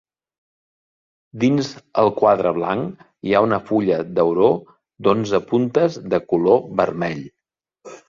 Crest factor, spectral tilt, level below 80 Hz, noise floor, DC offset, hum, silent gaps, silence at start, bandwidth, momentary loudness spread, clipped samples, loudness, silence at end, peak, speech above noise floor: 18 dB; -7 dB/octave; -58 dBFS; -59 dBFS; under 0.1%; none; none; 1.35 s; 7.6 kHz; 9 LU; under 0.1%; -19 LUFS; 0.1 s; -2 dBFS; 41 dB